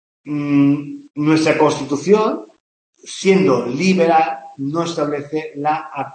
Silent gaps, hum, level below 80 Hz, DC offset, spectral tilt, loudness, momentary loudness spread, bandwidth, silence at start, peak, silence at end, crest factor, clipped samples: 2.60-2.93 s; none; -66 dBFS; under 0.1%; -6 dB/octave; -17 LUFS; 11 LU; 8.8 kHz; 0.25 s; 0 dBFS; 0 s; 16 dB; under 0.1%